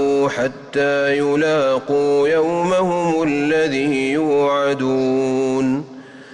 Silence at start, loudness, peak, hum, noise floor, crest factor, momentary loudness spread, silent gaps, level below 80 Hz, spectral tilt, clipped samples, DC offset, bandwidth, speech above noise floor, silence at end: 0 s; -18 LUFS; -8 dBFS; none; -37 dBFS; 8 dB; 4 LU; none; -56 dBFS; -5.5 dB/octave; under 0.1%; under 0.1%; 10.5 kHz; 20 dB; 0 s